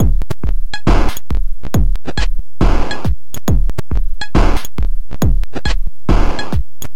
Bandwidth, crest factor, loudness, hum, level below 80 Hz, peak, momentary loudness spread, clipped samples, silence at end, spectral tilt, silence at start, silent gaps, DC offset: 17 kHz; 12 dB; -20 LUFS; none; -16 dBFS; 0 dBFS; 7 LU; under 0.1%; 0.1 s; -6 dB/octave; 0 s; none; 30%